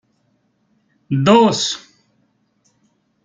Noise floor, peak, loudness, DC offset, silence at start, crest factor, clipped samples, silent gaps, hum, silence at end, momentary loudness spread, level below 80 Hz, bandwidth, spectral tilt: -64 dBFS; -2 dBFS; -15 LUFS; under 0.1%; 1.1 s; 18 dB; under 0.1%; none; none; 1.45 s; 12 LU; -60 dBFS; 9.4 kHz; -5 dB/octave